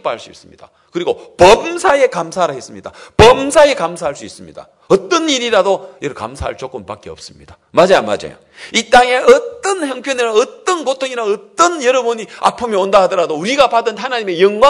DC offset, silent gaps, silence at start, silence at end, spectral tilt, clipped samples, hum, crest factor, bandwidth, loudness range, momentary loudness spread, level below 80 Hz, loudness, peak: under 0.1%; none; 0.05 s; 0 s; -3.5 dB/octave; 1%; none; 14 dB; 12 kHz; 6 LU; 18 LU; -40 dBFS; -13 LUFS; 0 dBFS